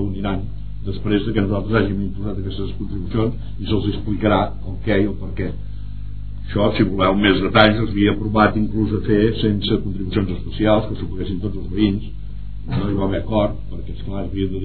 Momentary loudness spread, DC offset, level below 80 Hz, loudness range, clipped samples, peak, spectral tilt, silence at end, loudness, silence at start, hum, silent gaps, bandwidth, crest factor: 15 LU; 4%; -32 dBFS; 6 LU; under 0.1%; 0 dBFS; -10 dB/octave; 0 s; -20 LUFS; 0 s; 50 Hz at -30 dBFS; none; 4.6 kHz; 20 dB